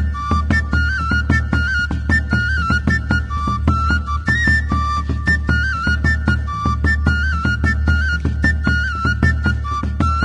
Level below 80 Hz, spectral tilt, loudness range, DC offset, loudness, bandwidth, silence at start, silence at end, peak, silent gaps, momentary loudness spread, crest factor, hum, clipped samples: -22 dBFS; -6 dB/octave; 0 LU; under 0.1%; -17 LUFS; 9.4 kHz; 0 s; 0 s; 0 dBFS; none; 3 LU; 16 dB; none; under 0.1%